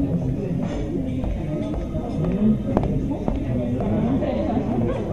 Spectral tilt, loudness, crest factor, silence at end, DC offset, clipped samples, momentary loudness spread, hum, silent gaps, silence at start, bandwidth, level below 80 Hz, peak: -9.5 dB/octave; -24 LUFS; 22 dB; 0 s; 0.7%; under 0.1%; 6 LU; none; none; 0 s; 8.8 kHz; -32 dBFS; 0 dBFS